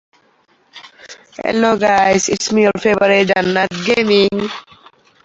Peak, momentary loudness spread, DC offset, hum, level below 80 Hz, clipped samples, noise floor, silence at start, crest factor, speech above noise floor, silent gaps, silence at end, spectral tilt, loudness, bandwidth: 0 dBFS; 11 LU; under 0.1%; none; -52 dBFS; under 0.1%; -56 dBFS; 0.75 s; 16 dB; 42 dB; none; 0.65 s; -4 dB/octave; -14 LUFS; 8.2 kHz